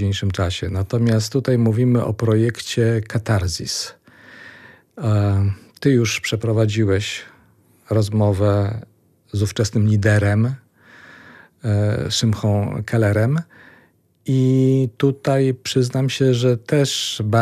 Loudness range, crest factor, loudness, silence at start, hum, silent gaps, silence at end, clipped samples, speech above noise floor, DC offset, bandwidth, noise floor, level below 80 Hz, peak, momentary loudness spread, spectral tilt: 3 LU; 16 dB; -19 LUFS; 0 s; none; none; 0 s; under 0.1%; 38 dB; under 0.1%; 14 kHz; -56 dBFS; -48 dBFS; -2 dBFS; 8 LU; -6 dB/octave